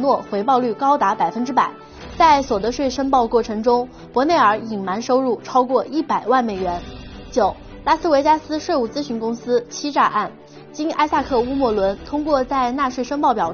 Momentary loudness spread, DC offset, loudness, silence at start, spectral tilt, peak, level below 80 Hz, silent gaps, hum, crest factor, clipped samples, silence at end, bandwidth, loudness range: 9 LU; under 0.1%; -19 LUFS; 0 s; -3.5 dB/octave; -2 dBFS; -44 dBFS; none; none; 16 dB; under 0.1%; 0 s; 6.8 kHz; 3 LU